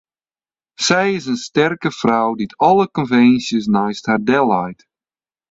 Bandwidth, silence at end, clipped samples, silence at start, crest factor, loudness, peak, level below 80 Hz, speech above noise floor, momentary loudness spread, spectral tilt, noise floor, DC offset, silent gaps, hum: 8 kHz; 0.75 s; under 0.1%; 0.8 s; 16 dB; -16 LUFS; 0 dBFS; -56 dBFS; over 74 dB; 7 LU; -5 dB/octave; under -90 dBFS; under 0.1%; none; none